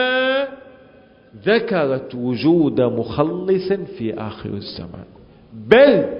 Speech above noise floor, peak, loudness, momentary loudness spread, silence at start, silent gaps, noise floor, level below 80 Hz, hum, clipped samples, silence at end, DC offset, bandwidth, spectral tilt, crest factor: 30 dB; 0 dBFS; -18 LUFS; 17 LU; 0 s; none; -48 dBFS; -50 dBFS; none; under 0.1%; 0 s; under 0.1%; 5.4 kHz; -9 dB/octave; 18 dB